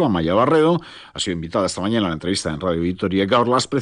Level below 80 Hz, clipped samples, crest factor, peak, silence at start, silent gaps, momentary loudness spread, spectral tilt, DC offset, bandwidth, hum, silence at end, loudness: -50 dBFS; under 0.1%; 14 dB; -6 dBFS; 0 s; none; 8 LU; -5.5 dB/octave; under 0.1%; 10 kHz; none; 0 s; -20 LUFS